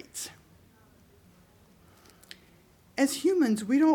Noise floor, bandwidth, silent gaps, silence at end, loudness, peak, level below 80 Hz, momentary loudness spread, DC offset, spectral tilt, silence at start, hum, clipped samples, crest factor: -59 dBFS; 19 kHz; none; 0 s; -28 LUFS; -12 dBFS; -68 dBFS; 25 LU; under 0.1%; -4 dB/octave; 0.15 s; none; under 0.1%; 18 dB